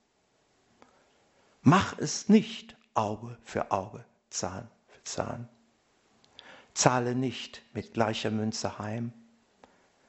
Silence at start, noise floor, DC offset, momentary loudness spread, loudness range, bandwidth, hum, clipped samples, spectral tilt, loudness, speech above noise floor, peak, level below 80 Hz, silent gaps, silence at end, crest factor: 1.65 s; -71 dBFS; under 0.1%; 19 LU; 8 LU; 8.2 kHz; none; under 0.1%; -5 dB/octave; -30 LUFS; 41 dB; -4 dBFS; -64 dBFS; none; 0.95 s; 28 dB